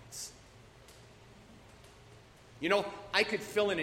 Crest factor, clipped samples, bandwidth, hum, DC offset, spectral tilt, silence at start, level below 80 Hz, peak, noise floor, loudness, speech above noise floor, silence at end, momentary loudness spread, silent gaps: 24 dB; under 0.1%; 16 kHz; none; under 0.1%; -3 dB/octave; 0 s; -66 dBFS; -12 dBFS; -57 dBFS; -33 LUFS; 25 dB; 0 s; 26 LU; none